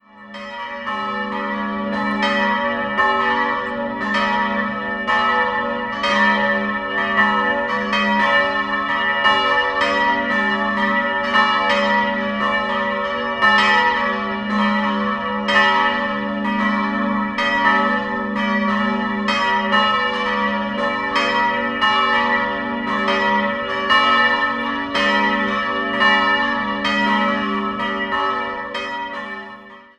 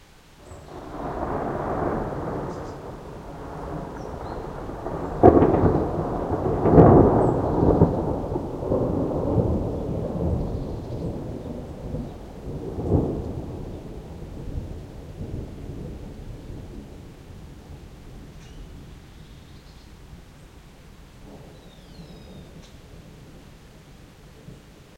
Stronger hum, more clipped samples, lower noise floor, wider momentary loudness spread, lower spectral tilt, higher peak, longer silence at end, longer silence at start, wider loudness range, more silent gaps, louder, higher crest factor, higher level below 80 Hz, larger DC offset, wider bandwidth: neither; neither; second, -39 dBFS vs -49 dBFS; second, 8 LU vs 26 LU; second, -4.5 dB/octave vs -9.5 dB/octave; about the same, -2 dBFS vs 0 dBFS; first, 0.2 s vs 0 s; first, 0.15 s vs 0 s; second, 2 LU vs 27 LU; neither; first, -18 LUFS vs -23 LUFS; second, 18 dB vs 26 dB; second, -50 dBFS vs -38 dBFS; neither; second, 10.5 kHz vs 15.5 kHz